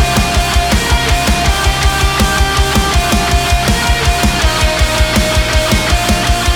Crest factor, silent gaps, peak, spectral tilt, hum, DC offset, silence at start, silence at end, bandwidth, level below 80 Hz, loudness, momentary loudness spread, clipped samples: 12 dB; none; 0 dBFS; -3.5 dB/octave; none; under 0.1%; 0 s; 0 s; over 20 kHz; -16 dBFS; -12 LUFS; 1 LU; under 0.1%